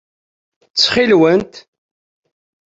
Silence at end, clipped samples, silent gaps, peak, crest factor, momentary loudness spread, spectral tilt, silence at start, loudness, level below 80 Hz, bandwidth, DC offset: 1.15 s; under 0.1%; none; -2 dBFS; 16 dB; 11 LU; -4 dB/octave; 0.75 s; -13 LUFS; -52 dBFS; 8 kHz; under 0.1%